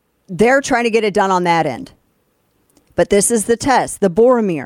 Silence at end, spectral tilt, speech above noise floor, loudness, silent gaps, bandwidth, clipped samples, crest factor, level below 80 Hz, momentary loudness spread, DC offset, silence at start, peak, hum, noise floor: 0 s; -4 dB/octave; 48 dB; -15 LUFS; none; 16 kHz; under 0.1%; 14 dB; -46 dBFS; 9 LU; under 0.1%; 0.3 s; -2 dBFS; none; -62 dBFS